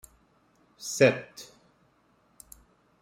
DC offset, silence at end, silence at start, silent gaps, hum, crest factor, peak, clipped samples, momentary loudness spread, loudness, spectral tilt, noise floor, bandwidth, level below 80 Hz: under 0.1%; 1.6 s; 0.8 s; none; none; 26 dB; -6 dBFS; under 0.1%; 28 LU; -26 LUFS; -4.5 dB/octave; -66 dBFS; 16 kHz; -68 dBFS